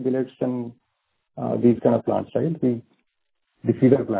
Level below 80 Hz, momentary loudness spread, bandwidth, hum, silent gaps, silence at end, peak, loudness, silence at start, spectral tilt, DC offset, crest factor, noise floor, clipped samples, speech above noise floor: -60 dBFS; 13 LU; 4 kHz; none; none; 0 s; -4 dBFS; -23 LUFS; 0 s; -13 dB/octave; under 0.1%; 20 dB; -76 dBFS; under 0.1%; 55 dB